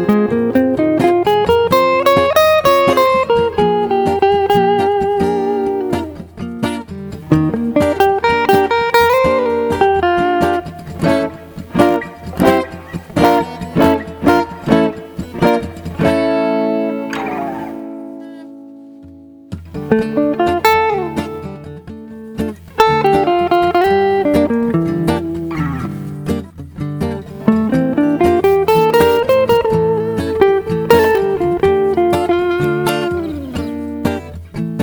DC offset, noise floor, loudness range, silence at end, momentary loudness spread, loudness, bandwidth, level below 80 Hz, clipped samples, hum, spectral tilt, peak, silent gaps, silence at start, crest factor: under 0.1%; -38 dBFS; 6 LU; 0 s; 15 LU; -14 LUFS; over 20 kHz; -38 dBFS; under 0.1%; none; -6.5 dB/octave; 0 dBFS; none; 0 s; 14 dB